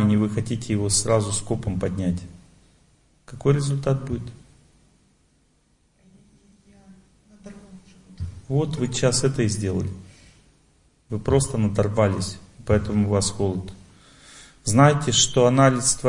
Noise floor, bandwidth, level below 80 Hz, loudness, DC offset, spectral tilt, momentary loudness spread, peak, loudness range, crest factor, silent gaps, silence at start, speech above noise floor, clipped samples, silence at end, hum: -63 dBFS; 11 kHz; -46 dBFS; -22 LUFS; under 0.1%; -5 dB/octave; 16 LU; -2 dBFS; 10 LU; 22 dB; none; 0 s; 42 dB; under 0.1%; 0 s; none